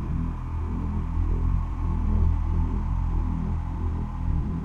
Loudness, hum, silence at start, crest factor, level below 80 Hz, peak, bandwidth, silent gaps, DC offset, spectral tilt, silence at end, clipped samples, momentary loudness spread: -28 LUFS; none; 0 s; 14 dB; -26 dBFS; -12 dBFS; 3.4 kHz; none; under 0.1%; -10 dB/octave; 0 s; under 0.1%; 5 LU